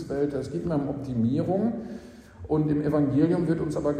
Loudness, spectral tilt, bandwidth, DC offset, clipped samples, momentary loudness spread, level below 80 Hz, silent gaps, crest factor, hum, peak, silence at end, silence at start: -26 LUFS; -9 dB/octave; 10 kHz; under 0.1%; under 0.1%; 11 LU; -50 dBFS; none; 16 dB; none; -10 dBFS; 0 s; 0 s